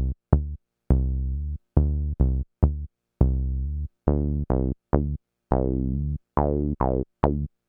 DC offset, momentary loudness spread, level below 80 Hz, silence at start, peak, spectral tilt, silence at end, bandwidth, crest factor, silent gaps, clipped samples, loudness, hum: under 0.1%; 7 LU; -28 dBFS; 0 s; 0 dBFS; -13 dB/octave; 0.2 s; 2.7 kHz; 24 dB; none; under 0.1%; -26 LUFS; none